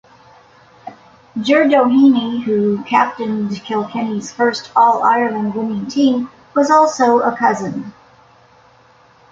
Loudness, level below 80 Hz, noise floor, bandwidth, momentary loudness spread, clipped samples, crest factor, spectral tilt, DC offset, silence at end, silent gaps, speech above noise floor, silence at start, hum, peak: -15 LUFS; -60 dBFS; -49 dBFS; 7.8 kHz; 10 LU; under 0.1%; 16 dB; -5.5 dB/octave; under 0.1%; 1.4 s; none; 34 dB; 0.85 s; none; 0 dBFS